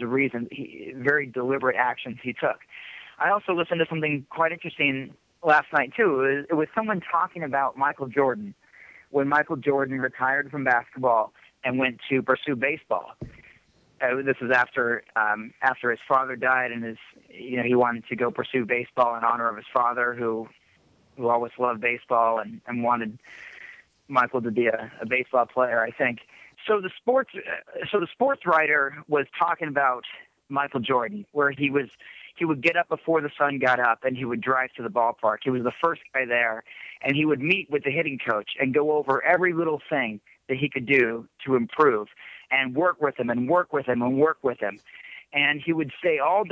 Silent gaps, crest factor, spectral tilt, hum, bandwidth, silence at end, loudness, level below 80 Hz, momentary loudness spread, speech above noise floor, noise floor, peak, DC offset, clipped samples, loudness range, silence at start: none; 18 dB; -7 dB/octave; none; 7.6 kHz; 0 s; -24 LUFS; -68 dBFS; 12 LU; 37 dB; -61 dBFS; -6 dBFS; under 0.1%; under 0.1%; 2 LU; 0 s